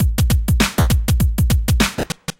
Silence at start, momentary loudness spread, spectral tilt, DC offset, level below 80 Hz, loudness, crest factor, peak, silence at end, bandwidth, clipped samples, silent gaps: 0 s; 2 LU; -5 dB/octave; under 0.1%; -20 dBFS; -17 LUFS; 14 dB; -2 dBFS; 0.1 s; 17 kHz; under 0.1%; none